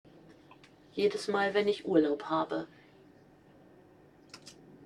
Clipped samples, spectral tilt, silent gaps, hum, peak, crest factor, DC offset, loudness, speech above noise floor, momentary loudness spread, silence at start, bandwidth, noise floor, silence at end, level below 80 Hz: under 0.1%; -5.5 dB/octave; none; none; -12 dBFS; 22 dB; under 0.1%; -31 LUFS; 29 dB; 23 LU; 0.3 s; 11.5 kHz; -59 dBFS; 0 s; -74 dBFS